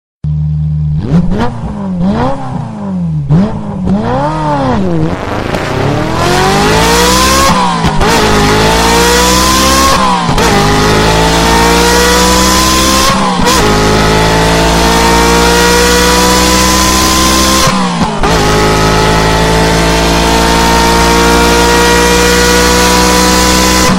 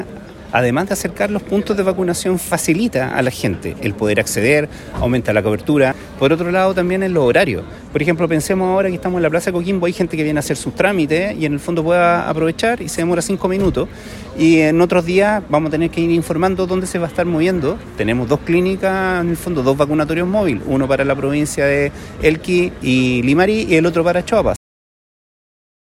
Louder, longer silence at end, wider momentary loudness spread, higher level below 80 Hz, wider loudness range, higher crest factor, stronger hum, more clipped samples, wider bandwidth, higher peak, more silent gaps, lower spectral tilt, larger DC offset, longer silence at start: first, -8 LUFS vs -16 LUFS; second, 0 s vs 1.3 s; about the same, 7 LU vs 6 LU; first, -18 dBFS vs -38 dBFS; first, 6 LU vs 2 LU; second, 8 dB vs 16 dB; neither; first, 0.2% vs under 0.1%; about the same, 17 kHz vs 16 kHz; about the same, 0 dBFS vs 0 dBFS; neither; second, -3.5 dB/octave vs -5.5 dB/octave; neither; first, 0.25 s vs 0 s